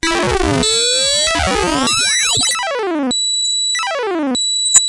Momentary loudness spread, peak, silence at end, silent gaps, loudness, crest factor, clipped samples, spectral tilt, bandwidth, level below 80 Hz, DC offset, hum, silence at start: 6 LU; 0 dBFS; 0 s; none; -14 LUFS; 16 dB; 0.1%; -1.5 dB/octave; 12 kHz; -34 dBFS; under 0.1%; 60 Hz at -50 dBFS; 0.05 s